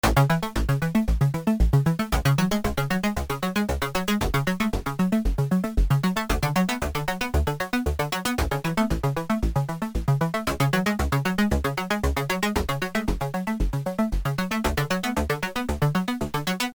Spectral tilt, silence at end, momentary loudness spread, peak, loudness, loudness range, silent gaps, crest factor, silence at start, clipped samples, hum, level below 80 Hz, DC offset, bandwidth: -5.5 dB/octave; 0.05 s; 5 LU; -6 dBFS; -25 LUFS; 2 LU; none; 18 dB; 0.05 s; under 0.1%; none; -30 dBFS; under 0.1%; over 20 kHz